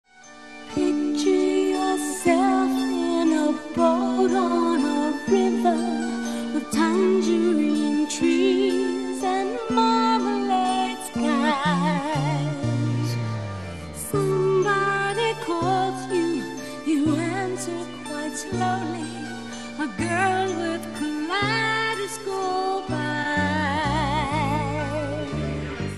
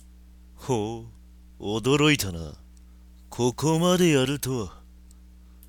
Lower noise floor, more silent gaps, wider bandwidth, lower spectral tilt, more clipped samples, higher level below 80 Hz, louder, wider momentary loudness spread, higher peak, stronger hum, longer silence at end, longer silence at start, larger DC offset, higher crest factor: second, -45 dBFS vs -49 dBFS; neither; second, 13 kHz vs 17.5 kHz; about the same, -5.5 dB/octave vs -5 dB/octave; neither; about the same, -48 dBFS vs -48 dBFS; about the same, -23 LUFS vs -24 LUFS; second, 9 LU vs 19 LU; about the same, -6 dBFS vs -8 dBFS; neither; second, 0 s vs 0.95 s; second, 0.15 s vs 0.6 s; first, 0.4% vs under 0.1%; about the same, 18 dB vs 18 dB